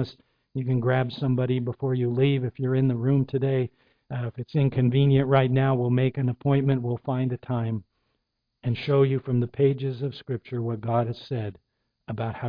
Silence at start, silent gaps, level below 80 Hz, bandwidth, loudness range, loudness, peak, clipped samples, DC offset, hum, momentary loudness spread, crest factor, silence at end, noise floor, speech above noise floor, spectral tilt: 0 s; none; -56 dBFS; 5.2 kHz; 4 LU; -25 LUFS; -8 dBFS; under 0.1%; under 0.1%; none; 11 LU; 18 dB; 0 s; -78 dBFS; 54 dB; -10.5 dB/octave